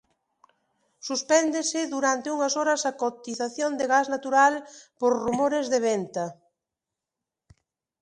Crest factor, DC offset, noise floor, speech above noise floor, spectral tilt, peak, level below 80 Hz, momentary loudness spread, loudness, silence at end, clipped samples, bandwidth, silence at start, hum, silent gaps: 20 dB; under 0.1%; -87 dBFS; 63 dB; -2.5 dB/octave; -6 dBFS; -68 dBFS; 10 LU; -25 LUFS; 1.7 s; under 0.1%; 11 kHz; 1.05 s; none; none